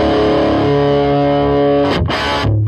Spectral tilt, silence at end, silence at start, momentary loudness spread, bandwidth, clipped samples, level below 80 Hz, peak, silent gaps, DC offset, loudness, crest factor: -7 dB/octave; 0 s; 0 s; 2 LU; 11 kHz; under 0.1%; -30 dBFS; -4 dBFS; none; under 0.1%; -13 LUFS; 10 dB